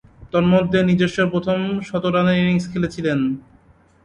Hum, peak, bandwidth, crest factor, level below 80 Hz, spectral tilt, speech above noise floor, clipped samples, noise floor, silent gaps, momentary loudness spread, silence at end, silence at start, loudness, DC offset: none; -4 dBFS; 8.8 kHz; 16 dB; -48 dBFS; -7 dB/octave; 34 dB; under 0.1%; -53 dBFS; none; 7 LU; 0.65 s; 0.2 s; -19 LUFS; under 0.1%